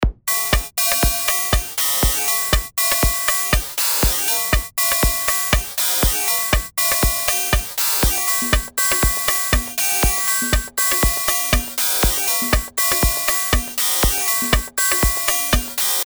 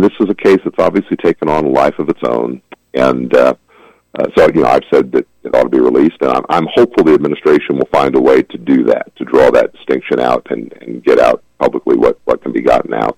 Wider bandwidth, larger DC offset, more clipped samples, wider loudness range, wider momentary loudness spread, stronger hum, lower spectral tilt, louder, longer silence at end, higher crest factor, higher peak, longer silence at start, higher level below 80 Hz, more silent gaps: first, over 20 kHz vs 12 kHz; neither; neither; about the same, 0 LU vs 2 LU; second, 3 LU vs 8 LU; neither; second, -2 dB/octave vs -7 dB/octave; second, -17 LUFS vs -12 LUFS; about the same, 0 s vs 0.05 s; first, 18 dB vs 12 dB; about the same, 0 dBFS vs 0 dBFS; about the same, 0 s vs 0 s; first, -26 dBFS vs -44 dBFS; neither